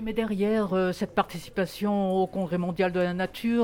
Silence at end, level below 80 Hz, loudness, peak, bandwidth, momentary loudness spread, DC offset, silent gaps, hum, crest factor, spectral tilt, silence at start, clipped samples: 0 s; -54 dBFS; -27 LUFS; -10 dBFS; 17 kHz; 4 LU; under 0.1%; none; none; 16 dB; -7 dB/octave; 0 s; under 0.1%